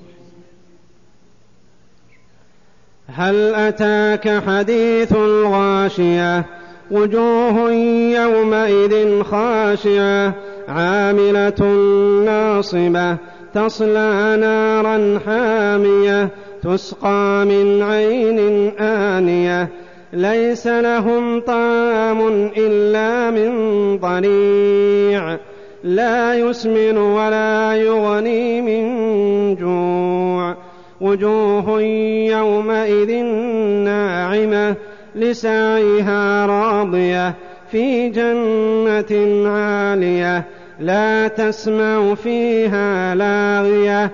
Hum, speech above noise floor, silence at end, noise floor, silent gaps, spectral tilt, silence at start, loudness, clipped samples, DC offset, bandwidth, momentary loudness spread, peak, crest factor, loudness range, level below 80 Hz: none; 39 dB; 0 s; -54 dBFS; none; -6.5 dB/octave; 3.1 s; -16 LUFS; under 0.1%; 0.5%; 7.2 kHz; 6 LU; -4 dBFS; 12 dB; 2 LU; -52 dBFS